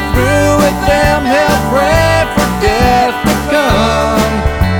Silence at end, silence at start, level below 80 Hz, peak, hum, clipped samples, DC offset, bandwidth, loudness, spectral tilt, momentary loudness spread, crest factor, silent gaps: 0 s; 0 s; -20 dBFS; 0 dBFS; none; under 0.1%; under 0.1%; 19.5 kHz; -11 LUFS; -5 dB/octave; 3 LU; 10 dB; none